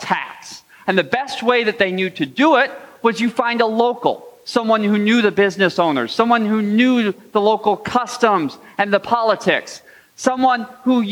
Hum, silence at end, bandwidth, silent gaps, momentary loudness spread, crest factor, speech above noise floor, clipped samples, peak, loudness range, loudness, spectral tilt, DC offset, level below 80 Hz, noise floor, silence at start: none; 0 s; 16 kHz; none; 8 LU; 16 dB; 22 dB; under 0.1%; -2 dBFS; 2 LU; -17 LUFS; -5 dB/octave; under 0.1%; -64 dBFS; -39 dBFS; 0 s